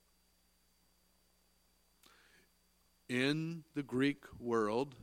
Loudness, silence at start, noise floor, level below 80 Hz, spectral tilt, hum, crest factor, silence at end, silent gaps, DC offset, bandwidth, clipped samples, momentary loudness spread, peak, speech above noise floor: -37 LUFS; 3.1 s; -74 dBFS; -74 dBFS; -6 dB/octave; 60 Hz at -75 dBFS; 22 dB; 0 s; none; under 0.1%; 16.5 kHz; under 0.1%; 8 LU; -18 dBFS; 37 dB